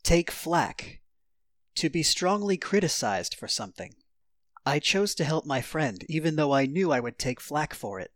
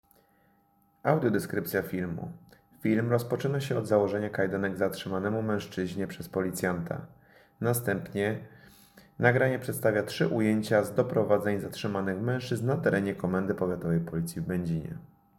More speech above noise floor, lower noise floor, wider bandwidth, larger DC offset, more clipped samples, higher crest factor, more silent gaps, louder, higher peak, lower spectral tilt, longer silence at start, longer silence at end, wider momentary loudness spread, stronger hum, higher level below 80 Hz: first, 55 dB vs 38 dB; first, -83 dBFS vs -67 dBFS; about the same, 18.5 kHz vs 17 kHz; neither; neither; about the same, 18 dB vs 22 dB; neither; about the same, -27 LUFS vs -29 LUFS; second, -10 dBFS vs -6 dBFS; second, -4 dB/octave vs -6.5 dB/octave; second, 0.05 s vs 1.05 s; second, 0.1 s vs 0.35 s; about the same, 10 LU vs 8 LU; neither; first, -46 dBFS vs -60 dBFS